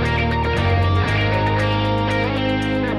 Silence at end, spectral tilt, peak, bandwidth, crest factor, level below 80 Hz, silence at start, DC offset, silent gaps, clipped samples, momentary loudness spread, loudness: 0 s; -7 dB/octave; -8 dBFS; 10 kHz; 12 dB; -30 dBFS; 0 s; under 0.1%; none; under 0.1%; 2 LU; -19 LUFS